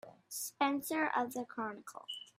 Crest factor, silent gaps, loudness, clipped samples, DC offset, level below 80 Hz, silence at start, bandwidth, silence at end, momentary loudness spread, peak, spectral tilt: 20 dB; none; -37 LUFS; under 0.1%; under 0.1%; -86 dBFS; 0.05 s; 16 kHz; 0.15 s; 12 LU; -18 dBFS; -2 dB/octave